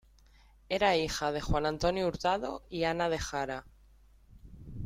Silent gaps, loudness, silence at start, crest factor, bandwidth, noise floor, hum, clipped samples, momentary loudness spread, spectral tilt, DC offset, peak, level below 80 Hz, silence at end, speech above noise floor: none; -32 LUFS; 0.7 s; 18 dB; 16 kHz; -60 dBFS; none; under 0.1%; 11 LU; -4.5 dB/octave; under 0.1%; -14 dBFS; -48 dBFS; 0 s; 29 dB